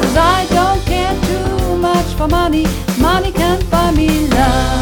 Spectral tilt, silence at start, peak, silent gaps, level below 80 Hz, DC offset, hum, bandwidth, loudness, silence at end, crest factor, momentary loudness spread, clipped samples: -5.5 dB/octave; 0 s; 0 dBFS; none; -20 dBFS; under 0.1%; none; 19 kHz; -14 LUFS; 0 s; 12 dB; 4 LU; under 0.1%